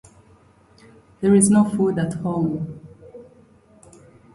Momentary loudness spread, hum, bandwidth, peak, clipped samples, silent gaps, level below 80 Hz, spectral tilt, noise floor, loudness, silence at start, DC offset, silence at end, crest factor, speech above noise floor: 16 LU; none; 11.5 kHz; -4 dBFS; under 0.1%; none; -54 dBFS; -6.5 dB/octave; -53 dBFS; -19 LUFS; 1.2 s; under 0.1%; 1.1 s; 18 dB; 35 dB